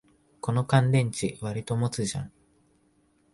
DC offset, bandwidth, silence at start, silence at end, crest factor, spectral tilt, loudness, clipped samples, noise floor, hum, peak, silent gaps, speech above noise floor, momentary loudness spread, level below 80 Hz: under 0.1%; 11.5 kHz; 0.45 s; 1.05 s; 18 dB; -6 dB/octave; -27 LUFS; under 0.1%; -66 dBFS; none; -10 dBFS; none; 40 dB; 14 LU; -58 dBFS